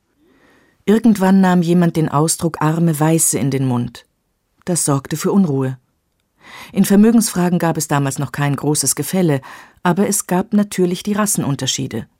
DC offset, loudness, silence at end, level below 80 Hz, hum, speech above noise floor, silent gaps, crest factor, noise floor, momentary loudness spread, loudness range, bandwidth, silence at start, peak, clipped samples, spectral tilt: under 0.1%; -16 LUFS; 0.15 s; -52 dBFS; none; 51 dB; none; 14 dB; -67 dBFS; 9 LU; 3 LU; 16.5 kHz; 0.85 s; -4 dBFS; under 0.1%; -5 dB/octave